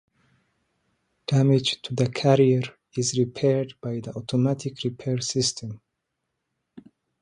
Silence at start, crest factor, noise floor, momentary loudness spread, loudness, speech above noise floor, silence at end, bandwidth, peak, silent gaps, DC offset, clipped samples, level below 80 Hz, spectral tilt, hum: 1.3 s; 20 dB; -80 dBFS; 13 LU; -24 LUFS; 57 dB; 0.4 s; 11 kHz; -4 dBFS; none; under 0.1%; under 0.1%; -62 dBFS; -5.5 dB/octave; none